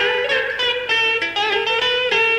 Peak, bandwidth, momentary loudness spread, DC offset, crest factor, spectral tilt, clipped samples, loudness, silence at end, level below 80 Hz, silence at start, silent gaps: -6 dBFS; 15.5 kHz; 3 LU; under 0.1%; 12 dB; -1.5 dB/octave; under 0.1%; -17 LUFS; 0 s; -56 dBFS; 0 s; none